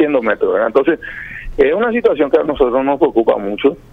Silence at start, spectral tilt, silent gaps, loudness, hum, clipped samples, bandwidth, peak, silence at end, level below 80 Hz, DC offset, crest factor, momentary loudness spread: 0 s; -7.5 dB/octave; none; -15 LUFS; none; under 0.1%; 4.9 kHz; 0 dBFS; 0.15 s; -38 dBFS; under 0.1%; 14 dB; 6 LU